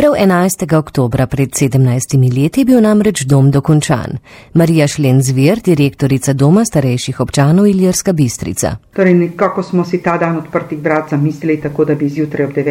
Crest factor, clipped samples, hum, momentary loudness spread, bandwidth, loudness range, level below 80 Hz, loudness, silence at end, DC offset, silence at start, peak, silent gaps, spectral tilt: 12 dB; 0.1%; none; 7 LU; 16.5 kHz; 3 LU; -40 dBFS; -12 LUFS; 0 s; under 0.1%; 0 s; 0 dBFS; none; -6.5 dB/octave